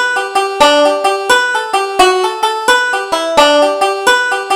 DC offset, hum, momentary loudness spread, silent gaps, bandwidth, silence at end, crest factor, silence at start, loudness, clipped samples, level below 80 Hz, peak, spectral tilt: under 0.1%; none; 6 LU; none; 17 kHz; 0 s; 12 dB; 0 s; -11 LUFS; under 0.1%; -48 dBFS; 0 dBFS; -1 dB/octave